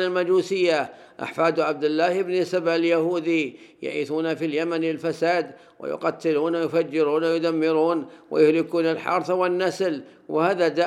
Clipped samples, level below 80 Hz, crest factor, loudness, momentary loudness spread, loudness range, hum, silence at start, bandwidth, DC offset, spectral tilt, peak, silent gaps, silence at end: under 0.1%; -80 dBFS; 16 dB; -23 LUFS; 8 LU; 3 LU; none; 0 s; 12 kHz; under 0.1%; -5.5 dB/octave; -6 dBFS; none; 0 s